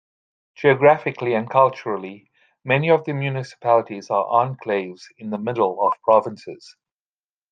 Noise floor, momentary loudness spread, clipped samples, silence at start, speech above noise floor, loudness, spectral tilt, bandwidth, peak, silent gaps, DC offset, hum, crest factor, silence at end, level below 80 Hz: under -90 dBFS; 17 LU; under 0.1%; 0.6 s; over 70 dB; -20 LUFS; -7 dB/octave; 9 kHz; -2 dBFS; none; under 0.1%; none; 20 dB; 0.95 s; -68 dBFS